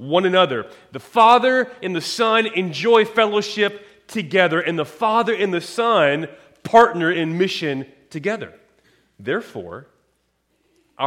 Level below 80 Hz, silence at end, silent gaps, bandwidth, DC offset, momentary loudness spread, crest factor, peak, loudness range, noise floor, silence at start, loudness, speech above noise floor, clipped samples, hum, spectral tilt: -64 dBFS; 0 s; none; 15.5 kHz; under 0.1%; 19 LU; 18 dB; -2 dBFS; 9 LU; -67 dBFS; 0 s; -18 LUFS; 49 dB; under 0.1%; none; -4.5 dB/octave